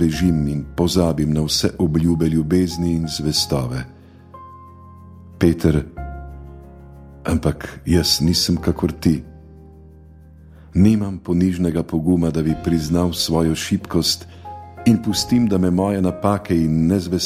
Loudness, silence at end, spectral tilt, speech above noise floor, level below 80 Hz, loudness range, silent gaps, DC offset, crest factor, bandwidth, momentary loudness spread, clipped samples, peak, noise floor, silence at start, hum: -19 LUFS; 0 s; -5.5 dB/octave; 25 dB; -36 dBFS; 5 LU; none; under 0.1%; 18 dB; 16 kHz; 12 LU; under 0.1%; -2 dBFS; -43 dBFS; 0 s; none